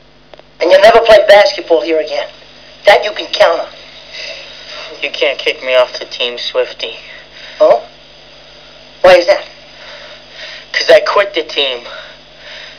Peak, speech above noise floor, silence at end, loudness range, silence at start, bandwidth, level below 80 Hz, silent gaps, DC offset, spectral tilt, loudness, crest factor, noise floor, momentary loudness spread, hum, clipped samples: 0 dBFS; 30 dB; 0.1 s; 7 LU; 0.6 s; 5.4 kHz; -48 dBFS; none; 0.4%; -2.5 dB/octave; -10 LUFS; 12 dB; -41 dBFS; 24 LU; none; 1%